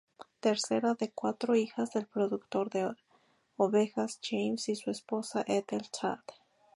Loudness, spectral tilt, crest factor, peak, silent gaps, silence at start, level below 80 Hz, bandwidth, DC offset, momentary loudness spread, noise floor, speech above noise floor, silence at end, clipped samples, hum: -33 LUFS; -4.5 dB/octave; 18 dB; -14 dBFS; none; 0.2 s; -80 dBFS; 11.5 kHz; under 0.1%; 7 LU; -69 dBFS; 37 dB; 0.45 s; under 0.1%; none